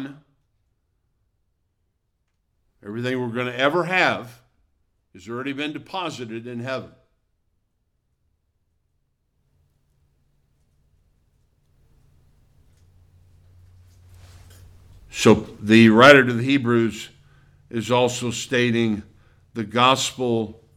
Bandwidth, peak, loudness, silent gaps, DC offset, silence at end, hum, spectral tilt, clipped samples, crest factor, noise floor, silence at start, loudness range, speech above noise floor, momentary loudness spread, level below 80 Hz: 15 kHz; 0 dBFS; -19 LUFS; none; under 0.1%; 0.25 s; none; -5 dB/octave; under 0.1%; 24 dB; -72 dBFS; 0 s; 18 LU; 53 dB; 19 LU; -58 dBFS